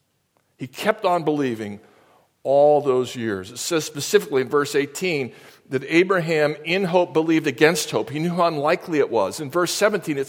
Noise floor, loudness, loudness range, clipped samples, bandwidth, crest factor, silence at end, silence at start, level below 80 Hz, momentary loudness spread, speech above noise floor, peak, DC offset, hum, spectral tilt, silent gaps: -67 dBFS; -21 LUFS; 2 LU; under 0.1%; 17 kHz; 22 dB; 0 s; 0.6 s; -68 dBFS; 10 LU; 46 dB; 0 dBFS; under 0.1%; none; -4.5 dB/octave; none